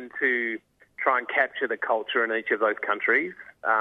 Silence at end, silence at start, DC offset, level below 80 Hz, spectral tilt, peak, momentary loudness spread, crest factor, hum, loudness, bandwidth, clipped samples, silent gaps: 0 s; 0 s; under 0.1%; -78 dBFS; -5.5 dB/octave; -8 dBFS; 7 LU; 18 dB; none; -25 LUFS; 6 kHz; under 0.1%; none